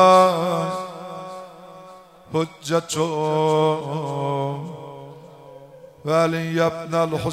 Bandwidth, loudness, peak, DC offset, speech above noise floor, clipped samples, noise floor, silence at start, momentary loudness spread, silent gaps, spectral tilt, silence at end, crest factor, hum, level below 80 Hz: 16 kHz; -22 LUFS; -4 dBFS; under 0.1%; 23 dB; under 0.1%; -45 dBFS; 0 s; 22 LU; none; -5.5 dB/octave; 0 s; 18 dB; none; -62 dBFS